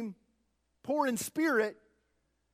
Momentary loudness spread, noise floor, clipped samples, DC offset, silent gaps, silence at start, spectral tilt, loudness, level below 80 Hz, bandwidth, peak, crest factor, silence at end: 13 LU; -77 dBFS; under 0.1%; under 0.1%; none; 0 s; -4 dB/octave; -31 LUFS; -78 dBFS; 16 kHz; -18 dBFS; 18 dB; 0.8 s